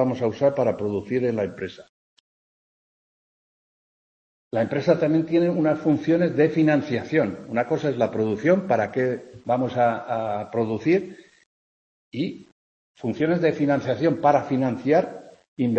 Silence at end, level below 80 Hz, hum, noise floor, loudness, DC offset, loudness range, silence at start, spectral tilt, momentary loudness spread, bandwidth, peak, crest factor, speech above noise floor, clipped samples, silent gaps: 0 s; -64 dBFS; none; under -90 dBFS; -23 LUFS; under 0.1%; 8 LU; 0 s; -8 dB/octave; 10 LU; 7.8 kHz; -4 dBFS; 20 dB; over 68 dB; under 0.1%; 1.89-4.51 s, 11.46-12.12 s, 12.52-12.94 s, 15.48-15.57 s